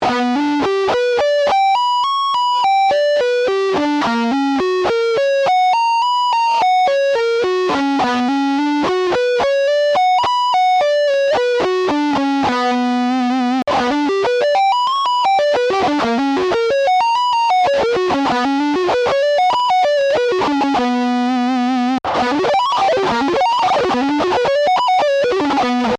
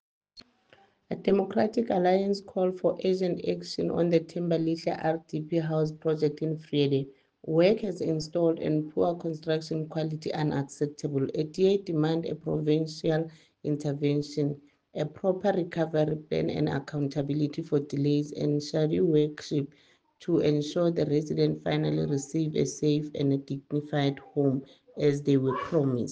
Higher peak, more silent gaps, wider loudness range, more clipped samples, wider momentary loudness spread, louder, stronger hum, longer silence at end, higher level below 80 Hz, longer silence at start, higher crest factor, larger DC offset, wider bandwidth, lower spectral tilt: about the same, -10 dBFS vs -10 dBFS; neither; about the same, 1 LU vs 2 LU; neither; second, 3 LU vs 7 LU; first, -15 LUFS vs -28 LUFS; neither; about the same, 0 s vs 0 s; first, -52 dBFS vs -64 dBFS; second, 0 s vs 0.35 s; second, 6 dB vs 18 dB; neither; first, 11 kHz vs 9.2 kHz; second, -4 dB/octave vs -7 dB/octave